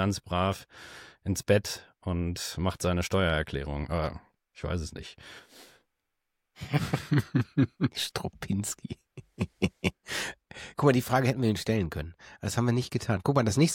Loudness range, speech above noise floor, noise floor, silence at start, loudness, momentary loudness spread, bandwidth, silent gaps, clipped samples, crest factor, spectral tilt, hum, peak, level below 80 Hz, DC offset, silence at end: 6 LU; 53 dB; -82 dBFS; 0 s; -30 LUFS; 17 LU; 17 kHz; none; under 0.1%; 20 dB; -5.5 dB/octave; none; -10 dBFS; -48 dBFS; under 0.1%; 0 s